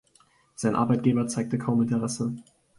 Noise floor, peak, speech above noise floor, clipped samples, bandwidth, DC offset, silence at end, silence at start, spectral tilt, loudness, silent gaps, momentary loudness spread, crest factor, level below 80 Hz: -62 dBFS; -10 dBFS; 37 dB; under 0.1%; 11.5 kHz; under 0.1%; 0.35 s; 0.6 s; -6.5 dB/octave; -26 LUFS; none; 8 LU; 18 dB; -62 dBFS